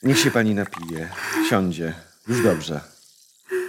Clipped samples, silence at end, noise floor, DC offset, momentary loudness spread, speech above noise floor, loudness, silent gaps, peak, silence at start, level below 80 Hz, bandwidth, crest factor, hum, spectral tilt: under 0.1%; 0 s; -54 dBFS; under 0.1%; 13 LU; 32 dB; -23 LUFS; none; -4 dBFS; 0.05 s; -56 dBFS; 16.5 kHz; 18 dB; none; -4.5 dB/octave